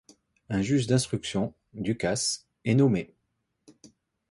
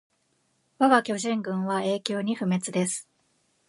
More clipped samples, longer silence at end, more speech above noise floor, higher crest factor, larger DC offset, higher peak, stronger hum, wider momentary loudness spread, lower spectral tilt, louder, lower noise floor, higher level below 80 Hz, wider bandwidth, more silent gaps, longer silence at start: neither; first, 1.25 s vs 0.65 s; first, 52 dB vs 45 dB; about the same, 18 dB vs 22 dB; neither; second, -10 dBFS vs -4 dBFS; neither; first, 10 LU vs 7 LU; about the same, -5 dB/octave vs -4.5 dB/octave; about the same, -27 LUFS vs -26 LUFS; first, -78 dBFS vs -71 dBFS; first, -56 dBFS vs -76 dBFS; about the same, 11.5 kHz vs 11.5 kHz; neither; second, 0.5 s vs 0.8 s